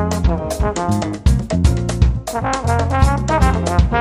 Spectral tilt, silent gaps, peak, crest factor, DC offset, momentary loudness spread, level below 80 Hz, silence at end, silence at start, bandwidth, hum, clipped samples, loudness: -6.5 dB/octave; none; 0 dBFS; 16 dB; under 0.1%; 4 LU; -20 dBFS; 0 s; 0 s; 15 kHz; none; under 0.1%; -17 LUFS